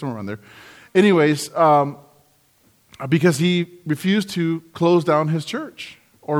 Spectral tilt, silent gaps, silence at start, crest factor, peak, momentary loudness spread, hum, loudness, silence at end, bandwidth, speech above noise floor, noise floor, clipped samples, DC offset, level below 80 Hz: -6 dB/octave; none; 0 s; 16 dB; -4 dBFS; 18 LU; none; -19 LUFS; 0 s; 16.5 kHz; 39 dB; -58 dBFS; under 0.1%; under 0.1%; -66 dBFS